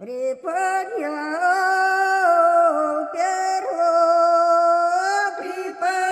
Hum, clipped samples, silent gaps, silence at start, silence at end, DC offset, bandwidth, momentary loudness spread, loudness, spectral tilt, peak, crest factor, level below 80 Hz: none; under 0.1%; none; 0 s; 0 s; under 0.1%; 13 kHz; 10 LU; -19 LUFS; -1.5 dB/octave; -6 dBFS; 14 dB; -82 dBFS